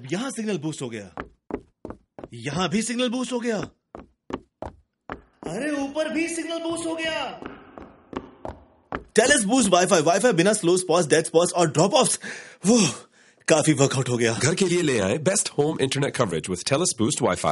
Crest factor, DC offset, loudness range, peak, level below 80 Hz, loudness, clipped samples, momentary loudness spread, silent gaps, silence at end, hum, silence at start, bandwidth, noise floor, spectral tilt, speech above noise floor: 22 dB; under 0.1%; 10 LU; -2 dBFS; -56 dBFS; -22 LUFS; under 0.1%; 21 LU; none; 0 s; none; 0 s; 11.5 kHz; -46 dBFS; -4 dB/octave; 24 dB